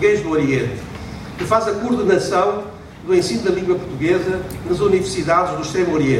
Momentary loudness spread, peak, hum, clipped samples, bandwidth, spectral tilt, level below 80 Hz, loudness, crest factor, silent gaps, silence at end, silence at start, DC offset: 12 LU; -2 dBFS; none; under 0.1%; 15.5 kHz; -5.5 dB/octave; -42 dBFS; -18 LUFS; 16 dB; none; 0 s; 0 s; under 0.1%